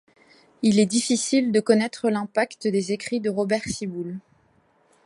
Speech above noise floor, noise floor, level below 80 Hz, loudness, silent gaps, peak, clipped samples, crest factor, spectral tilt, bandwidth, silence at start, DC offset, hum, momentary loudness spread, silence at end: 40 dB; -62 dBFS; -60 dBFS; -23 LUFS; none; -4 dBFS; under 0.1%; 20 dB; -4.5 dB/octave; 11.5 kHz; 0.6 s; under 0.1%; none; 10 LU; 0.85 s